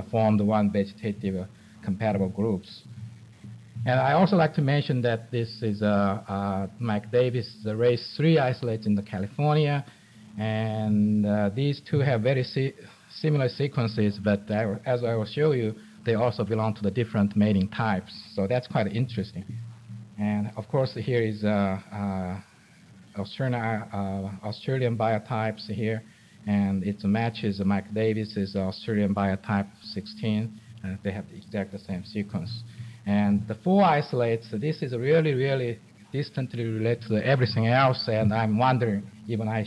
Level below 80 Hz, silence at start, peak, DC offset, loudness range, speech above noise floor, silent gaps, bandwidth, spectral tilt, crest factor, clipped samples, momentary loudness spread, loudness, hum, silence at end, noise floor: -66 dBFS; 0 s; -10 dBFS; under 0.1%; 5 LU; 28 dB; none; 11 kHz; -8 dB/octave; 16 dB; under 0.1%; 13 LU; -26 LUFS; none; 0 s; -53 dBFS